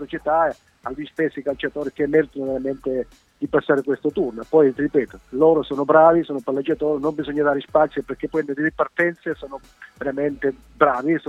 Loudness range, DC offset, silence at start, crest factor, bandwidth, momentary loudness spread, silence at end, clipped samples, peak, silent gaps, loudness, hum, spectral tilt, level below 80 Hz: 5 LU; under 0.1%; 0 s; 20 dB; 7.8 kHz; 12 LU; 0.1 s; under 0.1%; 0 dBFS; none; -21 LUFS; none; -7.5 dB/octave; -52 dBFS